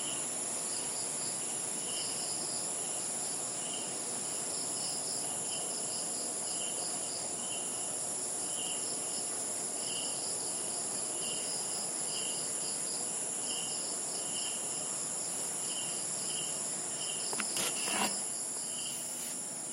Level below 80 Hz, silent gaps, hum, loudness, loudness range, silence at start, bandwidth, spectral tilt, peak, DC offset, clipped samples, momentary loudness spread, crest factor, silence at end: -80 dBFS; none; none; -34 LUFS; 1 LU; 0 s; 16 kHz; -0.5 dB/octave; -16 dBFS; under 0.1%; under 0.1%; 2 LU; 20 dB; 0 s